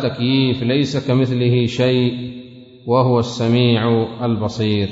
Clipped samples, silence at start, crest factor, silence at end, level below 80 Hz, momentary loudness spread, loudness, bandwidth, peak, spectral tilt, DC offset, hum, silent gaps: under 0.1%; 0 s; 14 dB; 0 s; -52 dBFS; 6 LU; -17 LUFS; 7.8 kHz; -2 dBFS; -7 dB/octave; under 0.1%; none; none